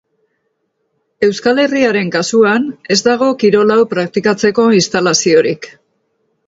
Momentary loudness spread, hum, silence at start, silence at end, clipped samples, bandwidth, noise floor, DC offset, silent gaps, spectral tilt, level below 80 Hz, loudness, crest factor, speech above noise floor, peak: 6 LU; none; 1.2 s; 0.8 s; under 0.1%; 8 kHz; -67 dBFS; under 0.1%; none; -4 dB/octave; -56 dBFS; -12 LUFS; 14 dB; 55 dB; 0 dBFS